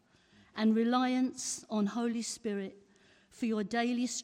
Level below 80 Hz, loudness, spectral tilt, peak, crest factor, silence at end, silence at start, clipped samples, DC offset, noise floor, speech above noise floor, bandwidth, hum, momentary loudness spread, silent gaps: -76 dBFS; -33 LUFS; -4 dB/octave; -18 dBFS; 16 dB; 0 s; 0.55 s; under 0.1%; under 0.1%; -64 dBFS; 32 dB; 13.5 kHz; none; 9 LU; none